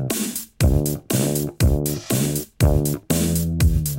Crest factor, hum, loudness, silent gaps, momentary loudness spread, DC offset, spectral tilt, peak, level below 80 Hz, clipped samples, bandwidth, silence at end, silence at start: 16 dB; none; -21 LUFS; none; 4 LU; under 0.1%; -5.5 dB/octave; -4 dBFS; -26 dBFS; under 0.1%; 17 kHz; 0 s; 0 s